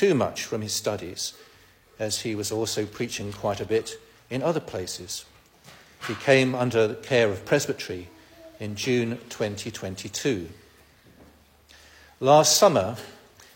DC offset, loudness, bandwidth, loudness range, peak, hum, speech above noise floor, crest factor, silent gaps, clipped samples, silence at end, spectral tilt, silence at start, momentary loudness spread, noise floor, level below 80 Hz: under 0.1%; -25 LUFS; 16.5 kHz; 7 LU; -6 dBFS; none; 31 dB; 22 dB; none; under 0.1%; 0.4 s; -4 dB/octave; 0 s; 16 LU; -55 dBFS; -60 dBFS